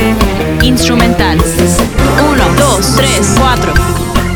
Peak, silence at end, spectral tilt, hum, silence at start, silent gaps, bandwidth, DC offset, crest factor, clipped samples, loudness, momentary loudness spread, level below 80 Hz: 0 dBFS; 0 s; -4.5 dB/octave; none; 0 s; none; over 20 kHz; under 0.1%; 8 dB; 0.4%; -9 LUFS; 3 LU; -16 dBFS